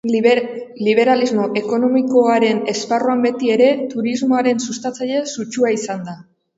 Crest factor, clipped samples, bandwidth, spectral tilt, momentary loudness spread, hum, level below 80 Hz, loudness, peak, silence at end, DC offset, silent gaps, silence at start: 16 dB; under 0.1%; 8 kHz; -4.5 dB/octave; 10 LU; none; -66 dBFS; -17 LUFS; 0 dBFS; 0.35 s; under 0.1%; none; 0.05 s